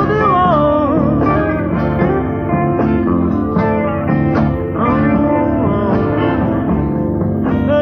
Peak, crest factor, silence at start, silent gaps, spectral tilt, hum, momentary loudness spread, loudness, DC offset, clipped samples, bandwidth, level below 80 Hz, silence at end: -2 dBFS; 12 dB; 0 s; none; -10.5 dB/octave; none; 4 LU; -14 LUFS; under 0.1%; under 0.1%; 6 kHz; -30 dBFS; 0 s